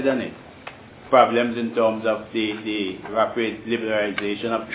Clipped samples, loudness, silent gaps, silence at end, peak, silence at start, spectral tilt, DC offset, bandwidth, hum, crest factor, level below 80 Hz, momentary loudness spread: under 0.1%; -22 LUFS; none; 0 s; -2 dBFS; 0 s; -9 dB/octave; under 0.1%; 4 kHz; none; 20 dB; -58 dBFS; 15 LU